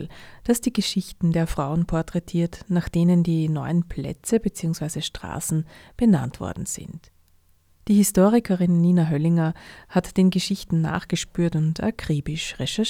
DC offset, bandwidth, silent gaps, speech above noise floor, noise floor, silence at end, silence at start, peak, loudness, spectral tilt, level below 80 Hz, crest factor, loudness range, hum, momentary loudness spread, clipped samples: under 0.1%; 16 kHz; none; 36 dB; -59 dBFS; 0 s; 0 s; -6 dBFS; -23 LUFS; -6 dB/octave; -44 dBFS; 18 dB; 5 LU; none; 12 LU; under 0.1%